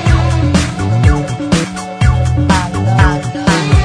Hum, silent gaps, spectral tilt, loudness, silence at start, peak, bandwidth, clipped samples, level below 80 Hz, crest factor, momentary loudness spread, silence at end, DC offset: none; none; -6 dB/octave; -13 LUFS; 0 s; 0 dBFS; 10.5 kHz; 0.2%; -20 dBFS; 12 dB; 4 LU; 0 s; under 0.1%